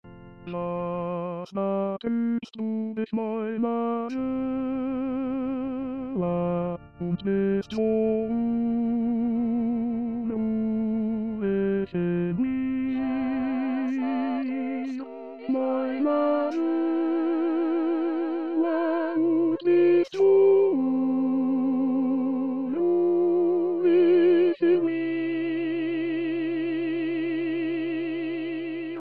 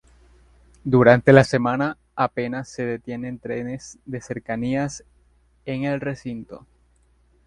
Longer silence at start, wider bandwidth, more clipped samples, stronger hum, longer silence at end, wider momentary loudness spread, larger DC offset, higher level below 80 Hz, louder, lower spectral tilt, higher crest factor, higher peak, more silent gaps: second, 0.05 s vs 0.85 s; second, 6 kHz vs 11 kHz; neither; neither; second, 0 s vs 0.9 s; second, 9 LU vs 20 LU; first, 0.2% vs under 0.1%; second, -60 dBFS vs -52 dBFS; second, -26 LUFS vs -21 LUFS; first, -9 dB/octave vs -7 dB/octave; second, 12 dB vs 22 dB; second, -12 dBFS vs 0 dBFS; neither